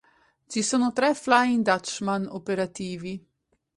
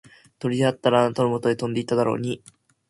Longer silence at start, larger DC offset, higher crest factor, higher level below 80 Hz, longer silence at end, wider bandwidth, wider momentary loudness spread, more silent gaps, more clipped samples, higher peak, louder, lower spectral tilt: about the same, 0.5 s vs 0.45 s; neither; about the same, 20 dB vs 18 dB; about the same, -66 dBFS vs -62 dBFS; about the same, 0.6 s vs 0.5 s; about the same, 11.5 kHz vs 11.5 kHz; first, 13 LU vs 10 LU; neither; neither; about the same, -6 dBFS vs -4 dBFS; about the same, -25 LUFS vs -23 LUFS; second, -4 dB/octave vs -6.5 dB/octave